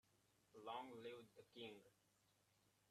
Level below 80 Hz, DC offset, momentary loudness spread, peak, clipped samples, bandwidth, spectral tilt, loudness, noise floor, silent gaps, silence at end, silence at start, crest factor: under -90 dBFS; under 0.1%; 10 LU; -40 dBFS; under 0.1%; 13 kHz; -4.5 dB/octave; -58 LUFS; -82 dBFS; none; 0.2 s; 0.15 s; 22 dB